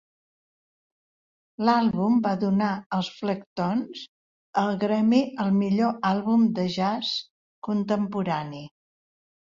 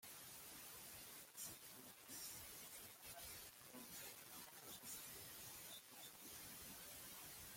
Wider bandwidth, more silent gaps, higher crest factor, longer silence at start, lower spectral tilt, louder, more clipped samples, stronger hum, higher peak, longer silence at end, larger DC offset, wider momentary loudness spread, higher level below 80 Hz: second, 7.4 kHz vs 16.5 kHz; first, 2.86-2.90 s, 3.46-3.56 s, 4.09-4.53 s, 7.31-7.62 s vs none; about the same, 18 dB vs 18 dB; first, 1.6 s vs 0 s; first, -7 dB/octave vs -1 dB/octave; first, -25 LUFS vs -55 LUFS; neither; neither; first, -8 dBFS vs -40 dBFS; first, 0.85 s vs 0 s; neither; first, 9 LU vs 4 LU; first, -66 dBFS vs -80 dBFS